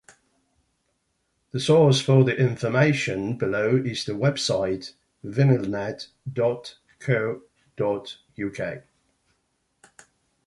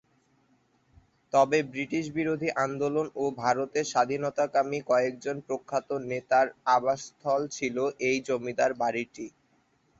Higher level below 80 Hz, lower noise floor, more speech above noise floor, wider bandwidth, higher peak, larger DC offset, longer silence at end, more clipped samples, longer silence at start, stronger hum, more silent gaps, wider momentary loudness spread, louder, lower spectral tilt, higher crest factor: first, -60 dBFS vs -70 dBFS; first, -73 dBFS vs -68 dBFS; first, 50 dB vs 40 dB; first, 11.5 kHz vs 8 kHz; first, -4 dBFS vs -10 dBFS; neither; first, 1.65 s vs 0.7 s; neither; first, 1.55 s vs 1.35 s; neither; neither; first, 17 LU vs 8 LU; first, -24 LUFS vs -28 LUFS; first, -6 dB/octave vs -4.5 dB/octave; about the same, 20 dB vs 18 dB